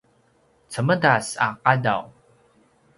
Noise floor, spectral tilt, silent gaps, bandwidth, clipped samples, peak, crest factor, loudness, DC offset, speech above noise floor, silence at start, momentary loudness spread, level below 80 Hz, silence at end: -61 dBFS; -5 dB/octave; none; 11.5 kHz; under 0.1%; -2 dBFS; 24 dB; -21 LUFS; under 0.1%; 40 dB; 0.7 s; 9 LU; -62 dBFS; 0.9 s